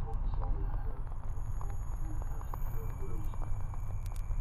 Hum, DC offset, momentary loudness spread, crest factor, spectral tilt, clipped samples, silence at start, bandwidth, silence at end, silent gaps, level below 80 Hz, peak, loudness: none; under 0.1%; 4 LU; 12 dB; -7.5 dB/octave; under 0.1%; 0 s; 14 kHz; 0 s; none; -34 dBFS; -20 dBFS; -41 LUFS